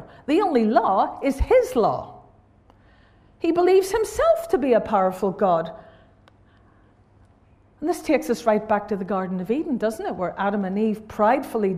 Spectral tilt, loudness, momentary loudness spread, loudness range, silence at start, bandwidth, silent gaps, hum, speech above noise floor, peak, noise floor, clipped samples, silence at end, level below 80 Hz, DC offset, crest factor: -6 dB/octave; -22 LUFS; 8 LU; 5 LU; 0 s; 15.5 kHz; none; none; 34 dB; -4 dBFS; -56 dBFS; under 0.1%; 0 s; -44 dBFS; under 0.1%; 18 dB